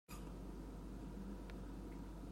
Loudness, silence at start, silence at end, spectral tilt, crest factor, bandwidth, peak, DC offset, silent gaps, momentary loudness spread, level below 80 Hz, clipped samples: -52 LUFS; 0.1 s; 0 s; -6.5 dB/octave; 10 dB; 16 kHz; -40 dBFS; under 0.1%; none; 1 LU; -54 dBFS; under 0.1%